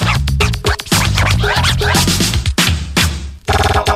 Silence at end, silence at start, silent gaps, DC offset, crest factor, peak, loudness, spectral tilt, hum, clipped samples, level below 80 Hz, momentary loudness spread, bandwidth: 0 s; 0 s; none; under 0.1%; 14 dB; 0 dBFS; -14 LUFS; -3.5 dB/octave; none; under 0.1%; -20 dBFS; 4 LU; 16 kHz